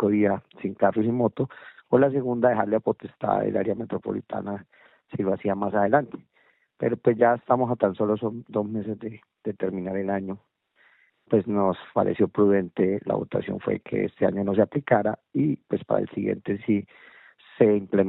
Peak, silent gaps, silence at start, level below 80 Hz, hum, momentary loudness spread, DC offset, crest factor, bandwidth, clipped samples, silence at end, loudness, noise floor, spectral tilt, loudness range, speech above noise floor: -4 dBFS; none; 0 s; -64 dBFS; none; 11 LU; under 0.1%; 20 dB; 4.1 kHz; under 0.1%; 0 s; -25 LUFS; -62 dBFS; -7.5 dB/octave; 4 LU; 38 dB